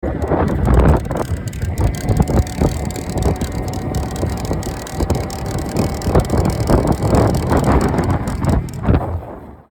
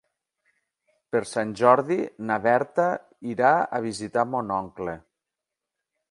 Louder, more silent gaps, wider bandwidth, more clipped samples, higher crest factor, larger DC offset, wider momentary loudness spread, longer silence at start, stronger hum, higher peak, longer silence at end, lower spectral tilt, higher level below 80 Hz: first, -18 LUFS vs -24 LUFS; neither; first, 18.5 kHz vs 11.5 kHz; neither; second, 16 dB vs 22 dB; neither; second, 8 LU vs 14 LU; second, 0 s vs 1.15 s; neither; about the same, -2 dBFS vs -4 dBFS; second, 0.1 s vs 1.15 s; first, -7 dB/octave vs -5.5 dB/octave; first, -22 dBFS vs -64 dBFS